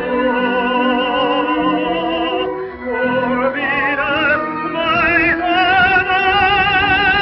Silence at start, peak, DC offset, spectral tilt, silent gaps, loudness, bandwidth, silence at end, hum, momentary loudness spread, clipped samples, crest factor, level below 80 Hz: 0 s; -2 dBFS; under 0.1%; -1.5 dB/octave; none; -15 LUFS; 5.8 kHz; 0 s; none; 7 LU; under 0.1%; 12 dB; -40 dBFS